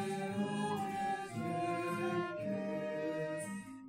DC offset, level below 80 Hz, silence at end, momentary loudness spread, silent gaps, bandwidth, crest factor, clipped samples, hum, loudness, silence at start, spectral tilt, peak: under 0.1%; -76 dBFS; 0 s; 3 LU; none; 16 kHz; 14 dB; under 0.1%; none; -38 LUFS; 0 s; -6 dB/octave; -24 dBFS